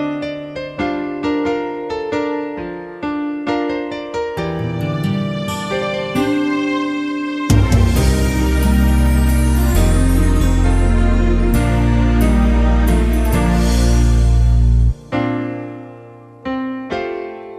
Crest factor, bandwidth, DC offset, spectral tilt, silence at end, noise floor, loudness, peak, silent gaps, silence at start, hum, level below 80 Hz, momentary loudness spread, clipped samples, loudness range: 14 dB; 15 kHz; under 0.1%; -6.5 dB/octave; 0 s; -38 dBFS; -17 LUFS; 0 dBFS; none; 0 s; none; -18 dBFS; 10 LU; under 0.1%; 7 LU